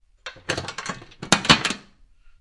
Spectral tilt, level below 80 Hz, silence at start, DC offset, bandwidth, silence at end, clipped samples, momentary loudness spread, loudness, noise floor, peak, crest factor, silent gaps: -2.5 dB/octave; -48 dBFS; 0.25 s; under 0.1%; 12 kHz; 0.6 s; under 0.1%; 21 LU; -21 LUFS; -51 dBFS; 0 dBFS; 26 dB; none